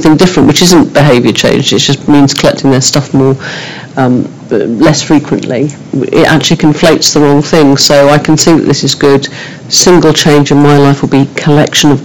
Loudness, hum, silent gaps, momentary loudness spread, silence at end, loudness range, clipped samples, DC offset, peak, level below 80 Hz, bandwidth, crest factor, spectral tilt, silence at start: -6 LUFS; none; none; 9 LU; 0 s; 4 LU; 6%; 2%; 0 dBFS; -36 dBFS; 19 kHz; 6 dB; -4.5 dB/octave; 0 s